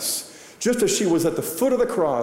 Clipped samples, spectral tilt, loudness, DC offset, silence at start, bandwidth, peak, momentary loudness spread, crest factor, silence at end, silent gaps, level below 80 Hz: under 0.1%; -3.5 dB/octave; -22 LUFS; under 0.1%; 0 s; 16 kHz; -10 dBFS; 7 LU; 12 dB; 0 s; none; -56 dBFS